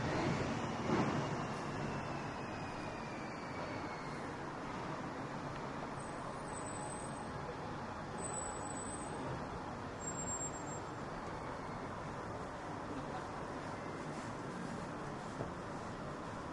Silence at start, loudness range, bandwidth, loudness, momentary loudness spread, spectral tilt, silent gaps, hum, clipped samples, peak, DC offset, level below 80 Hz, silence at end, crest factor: 0 s; 4 LU; 11.5 kHz; -43 LUFS; 6 LU; -5 dB/octave; none; none; under 0.1%; -24 dBFS; under 0.1%; -60 dBFS; 0 s; 20 dB